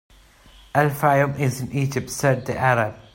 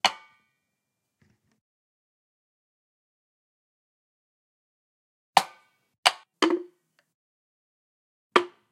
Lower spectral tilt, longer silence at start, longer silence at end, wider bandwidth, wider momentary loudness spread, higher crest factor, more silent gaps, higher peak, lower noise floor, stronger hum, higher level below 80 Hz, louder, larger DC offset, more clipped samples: first, -6 dB/octave vs -1.5 dB/octave; first, 0.75 s vs 0.05 s; about the same, 0.15 s vs 0.25 s; about the same, 16.5 kHz vs 16 kHz; about the same, 6 LU vs 8 LU; second, 18 dB vs 32 dB; second, none vs 1.61-5.33 s, 5.98-6.03 s, 7.14-8.30 s; second, -4 dBFS vs 0 dBFS; second, -50 dBFS vs -82 dBFS; neither; first, -52 dBFS vs -86 dBFS; first, -21 LUFS vs -25 LUFS; neither; neither